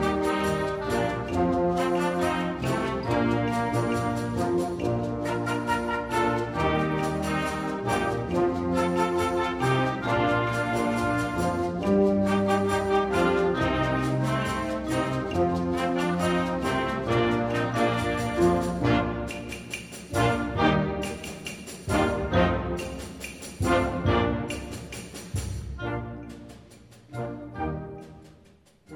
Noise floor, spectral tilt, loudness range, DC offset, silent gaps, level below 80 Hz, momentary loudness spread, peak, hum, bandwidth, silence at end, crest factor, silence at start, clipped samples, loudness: -57 dBFS; -6 dB/octave; 5 LU; under 0.1%; none; -42 dBFS; 12 LU; -8 dBFS; none; 16 kHz; 0 s; 18 dB; 0 s; under 0.1%; -26 LUFS